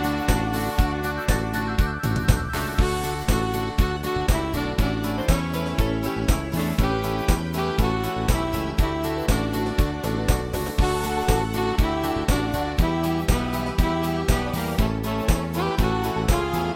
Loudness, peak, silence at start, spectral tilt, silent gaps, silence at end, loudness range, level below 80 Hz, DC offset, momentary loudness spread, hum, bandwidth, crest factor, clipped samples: -24 LUFS; -2 dBFS; 0 s; -5.5 dB/octave; none; 0 s; 1 LU; -26 dBFS; under 0.1%; 2 LU; none; 17 kHz; 20 dB; under 0.1%